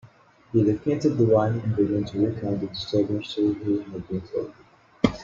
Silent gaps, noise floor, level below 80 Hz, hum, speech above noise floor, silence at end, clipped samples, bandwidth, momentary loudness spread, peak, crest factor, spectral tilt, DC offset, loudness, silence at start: none; -53 dBFS; -52 dBFS; none; 29 dB; 0 s; under 0.1%; 7.4 kHz; 11 LU; -4 dBFS; 20 dB; -8 dB/octave; under 0.1%; -25 LUFS; 0.05 s